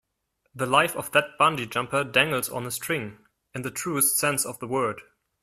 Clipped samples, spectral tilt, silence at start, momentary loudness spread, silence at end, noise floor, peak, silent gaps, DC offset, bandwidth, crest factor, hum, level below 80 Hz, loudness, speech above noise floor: under 0.1%; -2.5 dB/octave; 0.55 s; 12 LU; 0.4 s; -75 dBFS; -4 dBFS; none; under 0.1%; 15.5 kHz; 22 dB; none; -64 dBFS; -24 LUFS; 50 dB